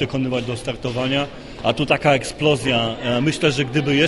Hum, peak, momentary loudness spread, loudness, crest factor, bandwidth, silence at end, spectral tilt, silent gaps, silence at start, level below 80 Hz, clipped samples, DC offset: none; -2 dBFS; 8 LU; -20 LUFS; 18 dB; 11.5 kHz; 0 s; -5 dB/octave; none; 0 s; -44 dBFS; under 0.1%; under 0.1%